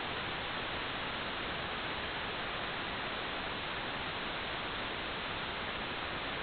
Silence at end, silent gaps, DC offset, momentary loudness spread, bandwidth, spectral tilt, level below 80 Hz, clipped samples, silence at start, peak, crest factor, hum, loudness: 0 s; none; under 0.1%; 1 LU; 4.9 kHz; -1 dB/octave; -56 dBFS; under 0.1%; 0 s; -26 dBFS; 14 dB; none; -37 LUFS